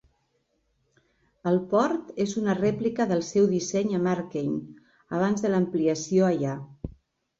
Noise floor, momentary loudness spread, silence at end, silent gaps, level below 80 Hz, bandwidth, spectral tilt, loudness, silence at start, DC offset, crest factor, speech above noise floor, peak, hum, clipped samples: -72 dBFS; 10 LU; 0.5 s; none; -58 dBFS; 7.8 kHz; -6.5 dB/octave; -26 LUFS; 1.45 s; under 0.1%; 16 dB; 47 dB; -10 dBFS; none; under 0.1%